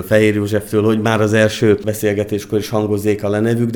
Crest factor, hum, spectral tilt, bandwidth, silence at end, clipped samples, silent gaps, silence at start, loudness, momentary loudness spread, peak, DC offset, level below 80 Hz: 14 dB; none; -6 dB/octave; 20 kHz; 0 s; under 0.1%; none; 0 s; -16 LUFS; 6 LU; 0 dBFS; under 0.1%; -48 dBFS